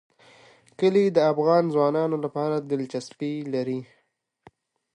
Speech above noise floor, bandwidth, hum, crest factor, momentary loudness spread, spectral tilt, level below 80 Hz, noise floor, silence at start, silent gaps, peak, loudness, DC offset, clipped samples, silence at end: 36 dB; 11 kHz; none; 18 dB; 11 LU; -7 dB/octave; -76 dBFS; -60 dBFS; 0.8 s; none; -8 dBFS; -24 LUFS; under 0.1%; under 0.1%; 1.1 s